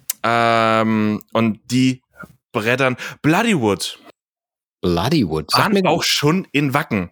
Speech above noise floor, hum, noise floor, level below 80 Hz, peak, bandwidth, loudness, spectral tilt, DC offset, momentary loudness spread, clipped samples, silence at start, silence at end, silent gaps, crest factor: over 73 dB; none; under -90 dBFS; -50 dBFS; -2 dBFS; over 20 kHz; -18 LUFS; -5 dB/octave; under 0.1%; 6 LU; under 0.1%; 0.1 s; 0.05 s; 4.28-4.33 s, 4.73-4.77 s; 18 dB